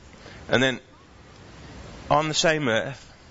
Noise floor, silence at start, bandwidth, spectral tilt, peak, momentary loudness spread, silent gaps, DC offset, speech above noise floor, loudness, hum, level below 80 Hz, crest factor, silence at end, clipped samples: -49 dBFS; 0.2 s; 8 kHz; -3.5 dB/octave; -8 dBFS; 22 LU; none; under 0.1%; 26 dB; -23 LUFS; none; -50 dBFS; 20 dB; 0.25 s; under 0.1%